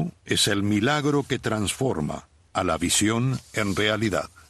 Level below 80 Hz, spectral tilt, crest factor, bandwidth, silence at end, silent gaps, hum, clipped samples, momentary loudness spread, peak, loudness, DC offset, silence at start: -50 dBFS; -4 dB/octave; 16 dB; 12.5 kHz; 0.25 s; none; none; under 0.1%; 7 LU; -8 dBFS; -24 LUFS; under 0.1%; 0 s